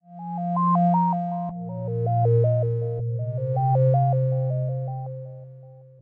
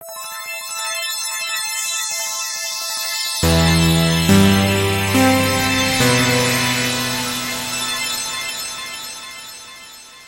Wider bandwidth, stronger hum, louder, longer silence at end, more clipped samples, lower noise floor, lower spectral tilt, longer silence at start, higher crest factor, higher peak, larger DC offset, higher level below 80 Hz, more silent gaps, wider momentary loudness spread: second, 2.4 kHz vs 17 kHz; neither; second, -24 LUFS vs -17 LUFS; first, 0.2 s vs 0 s; neither; first, -46 dBFS vs -39 dBFS; first, -13 dB/octave vs -3.5 dB/octave; about the same, 0.1 s vs 0 s; second, 12 dB vs 18 dB; second, -12 dBFS vs 0 dBFS; neither; second, -60 dBFS vs -38 dBFS; neither; about the same, 13 LU vs 14 LU